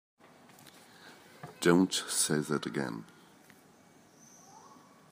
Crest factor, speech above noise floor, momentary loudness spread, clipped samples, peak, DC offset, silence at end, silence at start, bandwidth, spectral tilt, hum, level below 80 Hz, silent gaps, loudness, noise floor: 24 dB; 31 dB; 28 LU; under 0.1%; -10 dBFS; under 0.1%; 0.55 s; 0.65 s; 15.5 kHz; -4 dB/octave; none; -76 dBFS; none; -30 LUFS; -60 dBFS